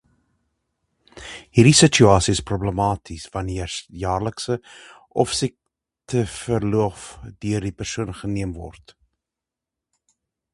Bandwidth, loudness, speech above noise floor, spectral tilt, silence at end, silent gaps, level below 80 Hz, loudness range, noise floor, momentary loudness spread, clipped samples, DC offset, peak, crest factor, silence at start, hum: 11.5 kHz; -21 LUFS; 66 dB; -4.5 dB/octave; 1.85 s; none; -42 dBFS; 10 LU; -87 dBFS; 18 LU; under 0.1%; under 0.1%; 0 dBFS; 22 dB; 1.15 s; none